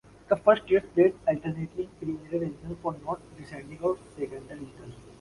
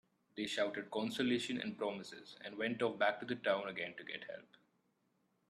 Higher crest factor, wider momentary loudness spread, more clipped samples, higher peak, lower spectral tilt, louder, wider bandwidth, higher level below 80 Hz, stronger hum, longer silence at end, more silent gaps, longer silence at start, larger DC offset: about the same, 22 dB vs 20 dB; first, 20 LU vs 14 LU; neither; first, -6 dBFS vs -20 dBFS; first, -7.5 dB/octave vs -4.5 dB/octave; first, -28 LUFS vs -39 LUFS; second, 11.5 kHz vs 13.5 kHz; first, -58 dBFS vs -84 dBFS; neither; second, 0.1 s vs 1.1 s; neither; about the same, 0.3 s vs 0.35 s; neither